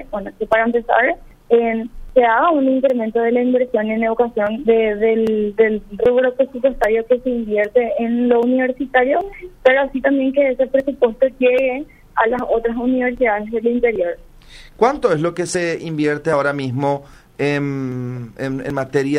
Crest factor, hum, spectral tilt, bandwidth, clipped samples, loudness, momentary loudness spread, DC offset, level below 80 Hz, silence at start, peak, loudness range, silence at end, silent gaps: 16 dB; none; -6 dB/octave; 11 kHz; under 0.1%; -17 LUFS; 8 LU; under 0.1%; -44 dBFS; 0 s; 0 dBFS; 3 LU; 0 s; none